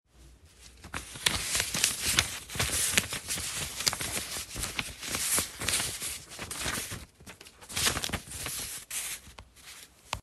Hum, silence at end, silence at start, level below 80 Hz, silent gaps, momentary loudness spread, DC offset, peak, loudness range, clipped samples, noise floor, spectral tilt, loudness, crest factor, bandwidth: none; 0 s; 0.15 s; -50 dBFS; none; 21 LU; under 0.1%; -2 dBFS; 5 LU; under 0.1%; -56 dBFS; -1 dB/octave; -30 LUFS; 32 dB; 16 kHz